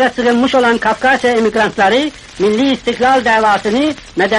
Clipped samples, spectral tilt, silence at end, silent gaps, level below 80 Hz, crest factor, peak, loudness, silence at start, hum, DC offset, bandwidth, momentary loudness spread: under 0.1%; -4 dB/octave; 0 s; none; -44 dBFS; 10 dB; -2 dBFS; -13 LUFS; 0 s; none; under 0.1%; 11.5 kHz; 5 LU